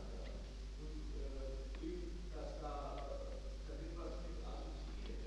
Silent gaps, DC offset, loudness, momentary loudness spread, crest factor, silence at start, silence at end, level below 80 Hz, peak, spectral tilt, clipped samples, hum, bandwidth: none; under 0.1%; -49 LUFS; 4 LU; 12 dB; 0 s; 0 s; -48 dBFS; -34 dBFS; -6 dB/octave; under 0.1%; none; 9.4 kHz